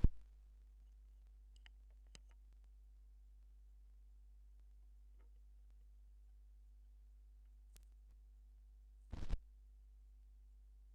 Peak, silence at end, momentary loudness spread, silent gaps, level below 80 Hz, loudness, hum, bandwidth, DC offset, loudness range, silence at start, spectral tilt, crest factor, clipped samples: -16 dBFS; 0 s; 11 LU; none; -50 dBFS; -60 LUFS; none; 8.4 kHz; under 0.1%; 8 LU; 0 s; -7.5 dB/octave; 32 dB; under 0.1%